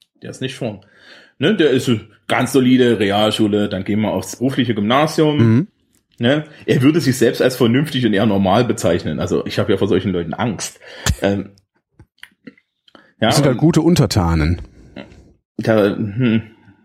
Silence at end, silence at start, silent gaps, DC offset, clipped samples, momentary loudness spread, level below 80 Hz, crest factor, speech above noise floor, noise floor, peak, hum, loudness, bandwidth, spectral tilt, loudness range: 0.35 s; 0.25 s; 15.45-15.55 s; under 0.1%; under 0.1%; 11 LU; -38 dBFS; 16 dB; 36 dB; -52 dBFS; -2 dBFS; none; -17 LUFS; 16 kHz; -6 dB/octave; 5 LU